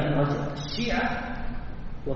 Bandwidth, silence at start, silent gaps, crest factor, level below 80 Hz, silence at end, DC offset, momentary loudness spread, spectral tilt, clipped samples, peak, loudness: 6.8 kHz; 0 s; none; 14 dB; -36 dBFS; 0 s; under 0.1%; 13 LU; -5 dB/octave; under 0.1%; -14 dBFS; -29 LUFS